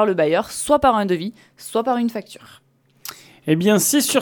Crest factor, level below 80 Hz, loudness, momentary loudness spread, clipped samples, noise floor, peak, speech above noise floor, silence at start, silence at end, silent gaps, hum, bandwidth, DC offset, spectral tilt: 18 dB; -50 dBFS; -19 LUFS; 20 LU; under 0.1%; -39 dBFS; -2 dBFS; 20 dB; 0 s; 0 s; none; none; 19 kHz; under 0.1%; -4 dB/octave